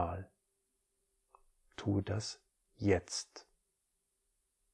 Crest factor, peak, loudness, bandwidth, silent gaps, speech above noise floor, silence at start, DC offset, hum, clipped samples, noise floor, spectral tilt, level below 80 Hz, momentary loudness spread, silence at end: 24 dB; -18 dBFS; -37 LUFS; 11 kHz; none; 47 dB; 0 s; under 0.1%; none; under 0.1%; -82 dBFS; -5.5 dB/octave; -62 dBFS; 20 LU; 1.3 s